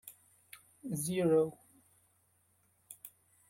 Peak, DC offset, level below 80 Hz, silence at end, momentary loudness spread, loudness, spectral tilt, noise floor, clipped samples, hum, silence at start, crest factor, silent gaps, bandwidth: -18 dBFS; under 0.1%; -76 dBFS; 0.4 s; 26 LU; -33 LUFS; -6 dB/octave; -73 dBFS; under 0.1%; none; 0.05 s; 20 dB; none; 16.5 kHz